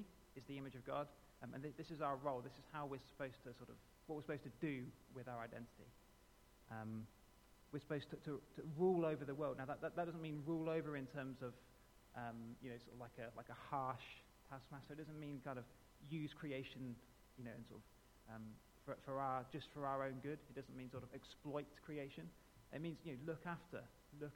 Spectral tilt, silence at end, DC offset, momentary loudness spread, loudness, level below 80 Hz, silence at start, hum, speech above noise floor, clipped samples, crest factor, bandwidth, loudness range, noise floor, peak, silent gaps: -7 dB/octave; 0 s; under 0.1%; 15 LU; -49 LUFS; -72 dBFS; 0 s; none; 21 dB; under 0.1%; 22 dB; 19 kHz; 9 LU; -69 dBFS; -28 dBFS; none